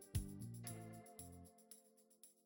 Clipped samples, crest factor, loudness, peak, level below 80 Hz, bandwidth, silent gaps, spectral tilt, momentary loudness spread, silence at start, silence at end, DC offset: under 0.1%; 22 dB; -54 LUFS; -30 dBFS; -60 dBFS; 17.5 kHz; none; -5 dB/octave; 15 LU; 0 s; 0.05 s; under 0.1%